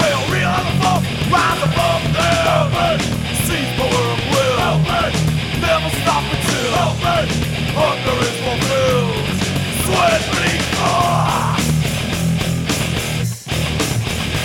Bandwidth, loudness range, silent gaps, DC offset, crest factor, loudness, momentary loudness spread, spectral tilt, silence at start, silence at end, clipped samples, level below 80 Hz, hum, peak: 18.5 kHz; 1 LU; none; under 0.1%; 16 dB; -17 LUFS; 4 LU; -4.5 dB/octave; 0 s; 0 s; under 0.1%; -32 dBFS; none; -2 dBFS